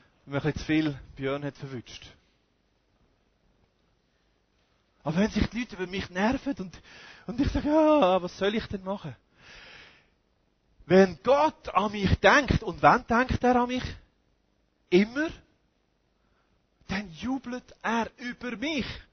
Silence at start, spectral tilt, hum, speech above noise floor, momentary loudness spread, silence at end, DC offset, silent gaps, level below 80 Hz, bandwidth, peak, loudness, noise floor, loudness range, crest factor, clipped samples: 0.25 s; -6 dB/octave; none; 45 dB; 18 LU; 0.1 s; under 0.1%; none; -44 dBFS; 6.6 kHz; -4 dBFS; -26 LUFS; -71 dBFS; 11 LU; 24 dB; under 0.1%